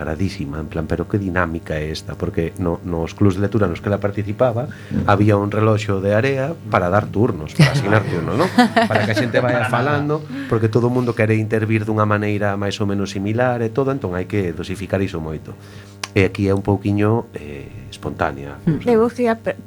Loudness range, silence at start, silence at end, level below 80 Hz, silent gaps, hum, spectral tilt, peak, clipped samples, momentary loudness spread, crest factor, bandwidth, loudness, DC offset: 5 LU; 0 s; 0 s; -42 dBFS; none; none; -7 dB/octave; 0 dBFS; under 0.1%; 10 LU; 18 dB; 19 kHz; -19 LUFS; under 0.1%